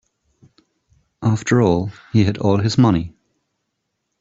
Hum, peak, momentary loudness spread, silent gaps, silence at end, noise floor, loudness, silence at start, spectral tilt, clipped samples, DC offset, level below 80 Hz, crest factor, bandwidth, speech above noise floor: none; -2 dBFS; 7 LU; none; 1.1 s; -75 dBFS; -18 LUFS; 1.2 s; -7 dB/octave; under 0.1%; under 0.1%; -48 dBFS; 16 dB; 8 kHz; 58 dB